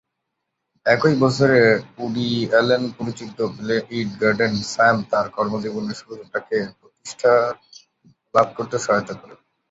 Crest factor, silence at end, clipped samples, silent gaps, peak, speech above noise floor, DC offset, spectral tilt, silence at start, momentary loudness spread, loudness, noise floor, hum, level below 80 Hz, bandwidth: 18 dB; 0.35 s; under 0.1%; none; -2 dBFS; 58 dB; under 0.1%; -5.5 dB/octave; 0.85 s; 14 LU; -20 LUFS; -78 dBFS; none; -58 dBFS; 8 kHz